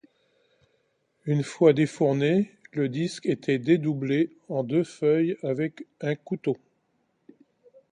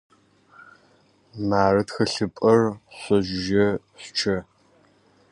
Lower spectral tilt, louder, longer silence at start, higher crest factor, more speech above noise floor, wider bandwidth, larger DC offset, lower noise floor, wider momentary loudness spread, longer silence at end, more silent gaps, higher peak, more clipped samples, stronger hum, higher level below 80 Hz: first, -7.5 dB/octave vs -5.5 dB/octave; second, -26 LUFS vs -23 LUFS; about the same, 1.25 s vs 1.35 s; about the same, 20 dB vs 20 dB; first, 47 dB vs 37 dB; about the same, 10.5 kHz vs 11 kHz; neither; first, -72 dBFS vs -59 dBFS; about the same, 10 LU vs 11 LU; first, 1.35 s vs 0.9 s; neither; about the same, -6 dBFS vs -4 dBFS; neither; neither; second, -70 dBFS vs -52 dBFS